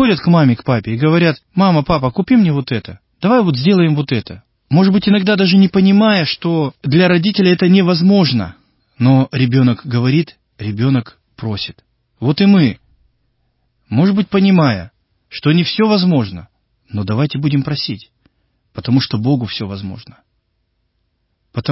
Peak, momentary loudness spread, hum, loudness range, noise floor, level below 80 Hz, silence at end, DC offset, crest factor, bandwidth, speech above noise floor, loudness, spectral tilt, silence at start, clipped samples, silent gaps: 0 dBFS; 14 LU; none; 7 LU; -66 dBFS; -46 dBFS; 0 s; under 0.1%; 14 dB; 5.8 kHz; 53 dB; -14 LUFS; -10.5 dB/octave; 0 s; under 0.1%; none